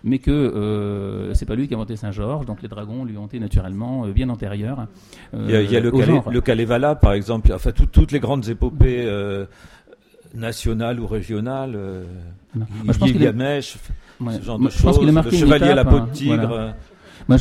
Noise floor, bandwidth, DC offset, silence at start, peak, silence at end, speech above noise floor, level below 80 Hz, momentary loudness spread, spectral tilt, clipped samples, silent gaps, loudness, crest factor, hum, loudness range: -49 dBFS; 13.5 kHz; under 0.1%; 0.05 s; -2 dBFS; 0 s; 31 dB; -24 dBFS; 16 LU; -7.5 dB/octave; under 0.1%; none; -20 LUFS; 16 dB; none; 9 LU